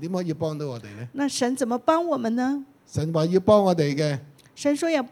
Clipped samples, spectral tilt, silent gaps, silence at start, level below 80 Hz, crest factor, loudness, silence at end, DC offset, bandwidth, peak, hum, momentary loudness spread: under 0.1%; -6 dB/octave; none; 0 s; -60 dBFS; 18 dB; -24 LUFS; 0.05 s; under 0.1%; 17 kHz; -6 dBFS; none; 14 LU